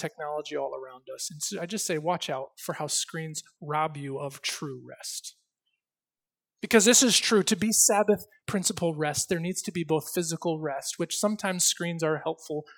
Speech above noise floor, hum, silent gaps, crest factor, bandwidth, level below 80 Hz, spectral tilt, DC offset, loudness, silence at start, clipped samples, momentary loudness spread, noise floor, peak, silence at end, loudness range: over 62 dB; none; none; 22 dB; 19 kHz; -70 dBFS; -2.5 dB/octave; under 0.1%; -27 LUFS; 0 s; under 0.1%; 16 LU; under -90 dBFS; -6 dBFS; 0.05 s; 10 LU